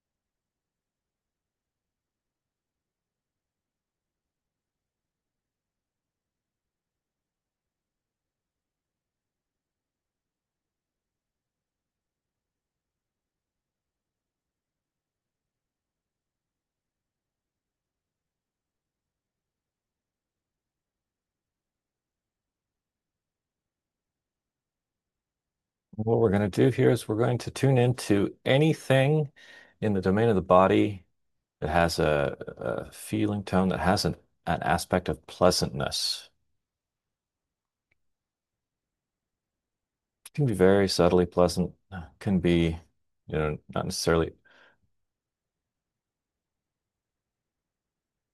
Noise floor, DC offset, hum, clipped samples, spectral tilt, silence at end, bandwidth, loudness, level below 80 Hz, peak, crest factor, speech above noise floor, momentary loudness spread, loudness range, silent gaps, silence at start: under -90 dBFS; under 0.1%; none; under 0.1%; -6 dB/octave; 4.05 s; 12.5 kHz; -26 LUFS; -56 dBFS; -6 dBFS; 24 dB; over 65 dB; 12 LU; 8 LU; none; 25.95 s